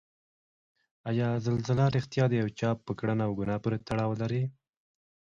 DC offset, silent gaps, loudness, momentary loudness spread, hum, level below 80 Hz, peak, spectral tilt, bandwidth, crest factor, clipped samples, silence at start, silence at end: under 0.1%; none; -30 LUFS; 6 LU; none; -60 dBFS; -14 dBFS; -8 dB/octave; 7.4 kHz; 16 dB; under 0.1%; 1.05 s; 0.8 s